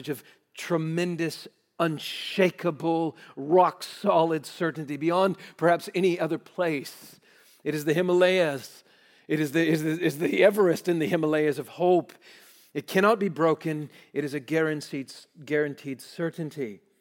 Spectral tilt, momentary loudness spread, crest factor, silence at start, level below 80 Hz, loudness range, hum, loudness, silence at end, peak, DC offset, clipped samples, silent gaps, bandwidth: -6 dB/octave; 15 LU; 20 dB; 0 s; -82 dBFS; 4 LU; none; -26 LUFS; 0.25 s; -6 dBFS; under 0.1%; under 0.1%; none; 17 kHz